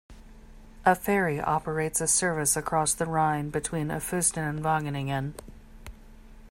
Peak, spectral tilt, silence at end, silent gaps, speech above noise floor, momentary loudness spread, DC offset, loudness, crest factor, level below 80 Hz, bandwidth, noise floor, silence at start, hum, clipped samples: -8 dBFS; -4 dB/octave; 0 s; none; 21 dB; 7 LU; under 0.1%; -26 LUFS; 20 dB; -48 dBFS; 16.5 kHz; -48 dBFS; 0.1 s; none; under 0.1%